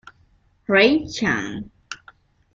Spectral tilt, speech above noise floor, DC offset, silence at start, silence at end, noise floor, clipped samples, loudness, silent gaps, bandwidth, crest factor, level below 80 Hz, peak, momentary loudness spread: -4.5 dB/octave; 40 dB; under 0.1%; 0.7 s; 0.6 s; -59 dBFS; under 0.1%; -19 LUFS; none; 7.8 kHz; 22 dB; -54 dBFS; -2 dBFS; 22 LU